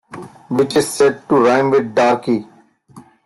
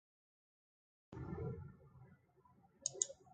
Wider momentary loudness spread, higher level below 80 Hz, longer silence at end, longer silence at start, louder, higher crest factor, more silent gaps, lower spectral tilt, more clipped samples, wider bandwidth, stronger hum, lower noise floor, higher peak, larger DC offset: second, 9 LU vs 24 LU; first, -58 dBFS vs -64 dBFS; first, 0.25 s vs 0 s; second, 0.1 s vs 1.1 s; first, -15 LUFS vs -45 LUFS; second, 14 dB vs 32 dB; neither; first, -5 dB/octave vs -3.5 dB/octave; neither; first, 12.5 kHz vs 9 kHz; neither; second, -44 dBFS vs -71 dBFS; first, -2 dBFS vs -18 dBFS; neither